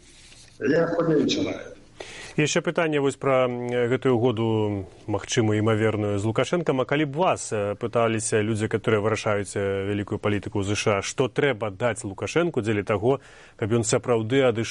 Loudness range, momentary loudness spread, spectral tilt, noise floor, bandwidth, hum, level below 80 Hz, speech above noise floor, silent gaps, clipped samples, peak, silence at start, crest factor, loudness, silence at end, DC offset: 2 LU; 7 LU; -5.5 dB/octave; -49 dBFS; 11.5 kHz; none; -56 dBFS; 25 dB; none; under 0.1%; -8 dBFS; 0.3 s; 16 dB; -24 LUFS; 0 s; under 0.1%